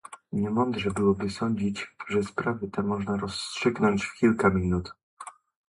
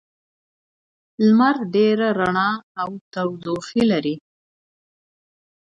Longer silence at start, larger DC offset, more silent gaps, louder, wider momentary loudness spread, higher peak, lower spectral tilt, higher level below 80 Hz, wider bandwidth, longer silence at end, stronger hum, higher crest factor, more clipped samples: second, 0.05 s vs 1.2 s; neither; second, 5.03-5.17 s vs 2.63-2.75 s, 3.01-3.11 s; second, -27 LUFS vs -20 LUFS; about the same, 12 LU vs 12 LU; about the same, -6 dBFS vs -4 dBFS; about the same, -6 dB/octave vs -6.5 dB/octave; first, -48 dBFS vs -62 dBFS; first, 11.5 kHz vs 7.8 kHz; second, 0.4 s vs 1.6 s; neither; about the same, 20 dB vs 18 dB; neither